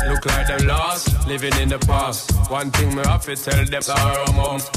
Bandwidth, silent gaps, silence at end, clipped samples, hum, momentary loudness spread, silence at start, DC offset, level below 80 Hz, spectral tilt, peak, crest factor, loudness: 16 kHz; none; 0 s; under 0.1%; none; 2 LU; 0 s; under 0.1%; -24 dBFS; -4.5 dB/octave; -4 dBFS; 14 dB; -19 LUFS